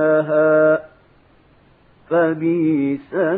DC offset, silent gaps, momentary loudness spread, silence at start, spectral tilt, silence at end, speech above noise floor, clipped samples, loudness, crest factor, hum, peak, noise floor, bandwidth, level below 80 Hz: under 0.1%; none; 8 LU; 0 s; -11.5 dB/octave; 0 s; 35 dB; under 0.1%; -17 LUFS; 14 dB; none; -4 dBFS; -53 dBFS; 4 kHz; -64 dBFS